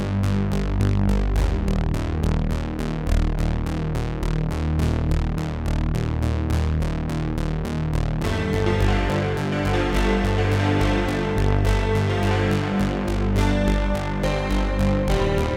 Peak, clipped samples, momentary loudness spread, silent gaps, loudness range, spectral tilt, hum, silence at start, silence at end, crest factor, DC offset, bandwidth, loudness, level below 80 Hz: -6 dBFS; under 0.1%; 5 LU; none; 3 LU; -7 dB/octave; none; 0 s; 0 s; 14 dB; under 0.1%; 15.5 kHz; -23 LUFS; -26 dBFS